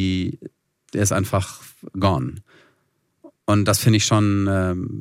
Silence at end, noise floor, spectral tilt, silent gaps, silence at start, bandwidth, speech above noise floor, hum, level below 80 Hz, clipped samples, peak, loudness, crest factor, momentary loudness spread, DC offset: 0 s; -69 dBFS; -5 dB/octave; none; 0 s; 16 kHz; 49 dB; none; -54 dBFS; under 0.1%; -4 dBFS; -21 LUFS; 18 dB; 16 LU; under 0.1%